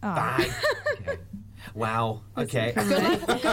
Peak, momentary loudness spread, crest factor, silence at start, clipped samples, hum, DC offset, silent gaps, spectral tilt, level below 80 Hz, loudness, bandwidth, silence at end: -10 dBFS; 13 LU; 16 dB; 0 s; under 0.1%; none; under 0.1%; none; -5 dB/octave; -50 dBFS; -27 LUFS; 17 kHz; 0 s